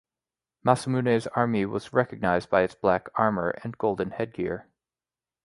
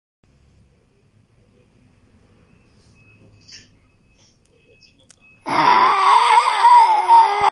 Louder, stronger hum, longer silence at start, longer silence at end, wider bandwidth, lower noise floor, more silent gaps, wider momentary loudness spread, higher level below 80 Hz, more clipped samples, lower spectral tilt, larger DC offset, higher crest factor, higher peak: second, -26 LUFS vs -13 LUFS; neither; second, 0.65 s vs 5.45 s; first, 0.85 s vs 0 s; about the same, 11.5 kHz vs 11.5 kHz; first, under -90 dBFS vs -58 dBFS; neither; about the same, 7 LU vs 7 LU; about the same, -56 dBFS vs -60 dBFS; neither; first, -7 dB/octave vs -2 dB/octave; neither; first, 24 dB vs 16 dB; about the same, -4 dBFS vs -2 dBFS